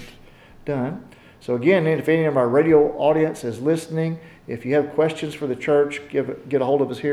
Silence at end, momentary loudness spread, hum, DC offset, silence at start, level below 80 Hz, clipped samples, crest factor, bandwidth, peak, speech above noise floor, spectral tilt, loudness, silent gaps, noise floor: 0 s; 12 LU; none; under 0.1%; 0 s; -56 dBFS; under 0.1%; 16 dB; 13 kHz; -4 dBFS; 26 dB; -7 dB/octave; -21 LUFS; none; -46 dBFS